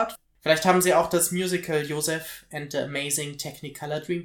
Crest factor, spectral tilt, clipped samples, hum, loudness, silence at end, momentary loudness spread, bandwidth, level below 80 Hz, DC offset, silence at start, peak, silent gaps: 20 dB; -3.5 dB/octave; under 0.1%; none; -25 LUFS; 0 s; 15 LU; 18 kHz; -60 dBFS; under 0.1%; 0 s; -4 dBFS; none